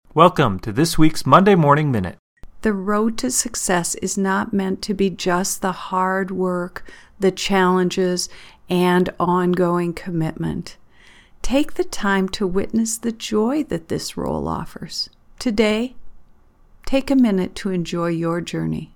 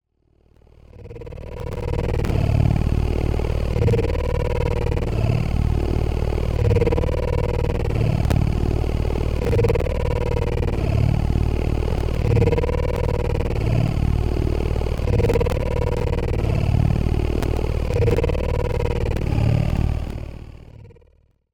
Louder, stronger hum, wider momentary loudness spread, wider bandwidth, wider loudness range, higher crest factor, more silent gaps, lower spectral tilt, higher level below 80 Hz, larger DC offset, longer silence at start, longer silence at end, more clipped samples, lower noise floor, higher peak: about the same, -20 LUFS vs -22 LUFS; neither; first, 11 LU vs 4 LU; first, 19 kHz vs 14 kHz; first, 5 LU vs 1 LU; about the same, 20 dB vs 16 dB; first, 2.19-2.36 s vs none; second, -5 dB/octave vs -8 dB/octave; second, -38 dBFS vs -24 dBFS; neither; second, 0.15 s vs 0.95 s; second, 0.1 s vs 0.6 s; neither; second, -50 dBFS vs -59 dBFS; first, 0 dBFS vs -4 dBFS